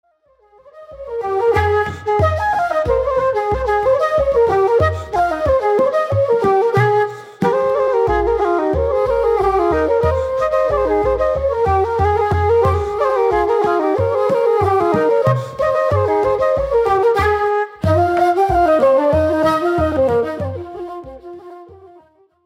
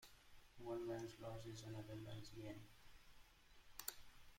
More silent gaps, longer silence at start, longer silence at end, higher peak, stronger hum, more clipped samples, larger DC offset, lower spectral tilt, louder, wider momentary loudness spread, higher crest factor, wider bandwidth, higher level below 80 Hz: neither; first, 0.75 s vs 0 s; first, 0.7 s vs 0 s; first, -2 dBFS vs -28 dBFS; neither; neither; neither; first, -7.5 dB/octave vs -5 dB/octave; first, -16 LUFS vs -53 LUFS; second, 5 LU vs 19 LU; second, 14 dB vs 28 dB; about the same, 15 kHz vs 16.5 kHz; first, -34 dBFS vs -70 dBFS